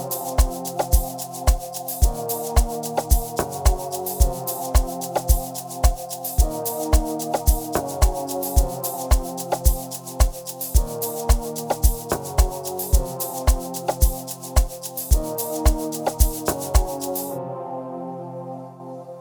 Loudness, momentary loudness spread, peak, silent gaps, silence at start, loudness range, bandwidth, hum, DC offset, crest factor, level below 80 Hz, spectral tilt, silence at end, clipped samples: -24 LUFS; 8 LU; -2 dBFS; none; 0 s; 1 LU; over 20 kHz; none; under 0.1%; 20 dB; -24 dBFS; -5 dB/octave; 0 s; under 0.1%